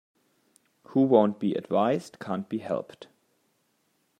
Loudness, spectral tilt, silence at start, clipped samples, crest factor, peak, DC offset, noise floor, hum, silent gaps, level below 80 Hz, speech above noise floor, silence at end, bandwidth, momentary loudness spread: -26 LUFS; -7.5 dB/octave; 0.9 s; under 0.1%; 22 dB; -6 dBFS; under 0.1%; -72 dBFS; none; none; -78 dBFS; 46 dB; 1.15 s; 10.5 kHz; 13 LU